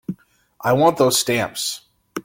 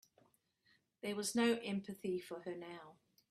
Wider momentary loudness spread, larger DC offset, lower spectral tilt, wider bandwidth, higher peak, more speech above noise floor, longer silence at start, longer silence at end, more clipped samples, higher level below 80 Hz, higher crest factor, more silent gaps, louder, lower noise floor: first, 19 LU vs 14 LU; neither; about the same, -3.5 dB/octave vs -4 dB/octave; first, 17 kHz vs 14.5 kHz; first, -2 dBFS vs -24 dBFS; second, 32 dB vs 36 dB; second, 0.1 s vs 1.05 s; second, 0.05 s vs 0.4 s; neither; first, -58 dBFS vs -82 dBFS; about the same, 18 dB vs 18 dB; neither; first, -18 LUFS vs -40 LUFS; second, -50 dBFS vs -76 dBFS